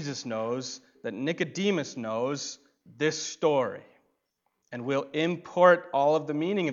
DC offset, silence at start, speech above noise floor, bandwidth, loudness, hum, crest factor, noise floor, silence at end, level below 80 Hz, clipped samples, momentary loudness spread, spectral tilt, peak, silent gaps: under 0.1%; 0 s; 50 dB; 7.6 kHz; -28 LUFS; none; 22 dB; -78 dBFS; 0 s; -80 dBFS; under 0.1%; 16 LU; -4.5 dB/octave; -6 dBFS; none